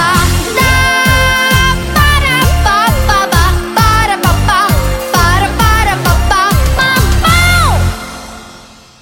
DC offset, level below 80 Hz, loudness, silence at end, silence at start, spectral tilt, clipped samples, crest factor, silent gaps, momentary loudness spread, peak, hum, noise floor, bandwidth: under 0.1%; -16 dBFS; -9 LUFS; 0.4 s; 0 s; -4 dB/octave; under 0.1%; 10 dB; none; 4 LU; 0 dBFS; none; -36 dBFS; 17.5 kHz